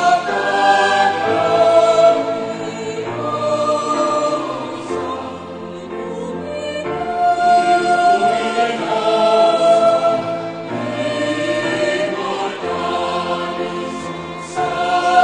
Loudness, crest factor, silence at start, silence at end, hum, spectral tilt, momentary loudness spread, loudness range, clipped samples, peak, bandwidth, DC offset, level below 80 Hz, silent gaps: -17 LUFS; 16 dB; 0 s; 0 s; none; -4 dB/octave; 13 LU; 6 LU; under 0.1%; 0 dBFS; 10 kHz; under 0.1%; -58 dBFS; none